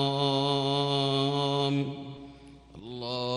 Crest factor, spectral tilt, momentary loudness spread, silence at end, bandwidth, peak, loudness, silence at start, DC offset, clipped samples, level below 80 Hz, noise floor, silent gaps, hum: 14 dB; -6 dB/octave; 18 LU; 0 s; 11 kHz; -14 dBFS; -28 LUFS; 0 s; under 0.1%; under 0.1%; -62 dBFS; -50 dBFS; none; none